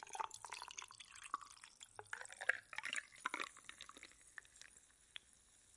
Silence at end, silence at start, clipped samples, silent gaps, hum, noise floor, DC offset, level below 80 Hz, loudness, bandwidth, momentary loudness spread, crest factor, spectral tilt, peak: 0 s; 0 s; under 0.1%; none; none; -70 dBFS; under 0.1%; -82 dBFS; -48 LUFS; 11.5 kHz; 18 LU; 32 dB; 0.5 dB/octave; -20 dBFS